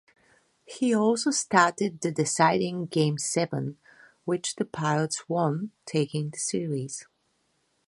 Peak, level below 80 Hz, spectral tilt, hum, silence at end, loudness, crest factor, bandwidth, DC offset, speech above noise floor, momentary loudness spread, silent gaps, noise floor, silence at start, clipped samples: -4 dBFS; -72 dBFS; -4.5 dB/octave; none; 0.85 s; -27 LUFS; 24 dB; 11.5 kHz; under 0.1%; 46 dB; 11 LU; none; -72 dBFS; 0.7 s; under 0.1%